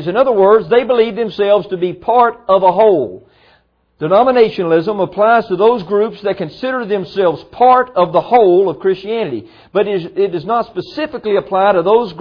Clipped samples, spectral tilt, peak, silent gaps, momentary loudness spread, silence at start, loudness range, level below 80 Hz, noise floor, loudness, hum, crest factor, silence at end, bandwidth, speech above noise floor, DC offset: under 0.1%; -8.5 dB/octave; 0 dBFS; none; 10 LU; 0 s; 3 LU; -54 dBFS; -54 dBFS; -13 LUFS; none; 14 dB; 0 s; 5.4 kHz; 42 dB; under 0.1%